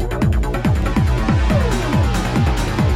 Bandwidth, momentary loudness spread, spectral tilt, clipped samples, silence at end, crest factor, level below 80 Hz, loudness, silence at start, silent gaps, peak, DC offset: 15 kHz; 2 LU; -6.5 dB/octave; under 0.1%; 0 s; 12 dB; -20 dBFS; -18 LUFS; 0 s; none; -4 dBFS; under 0.1%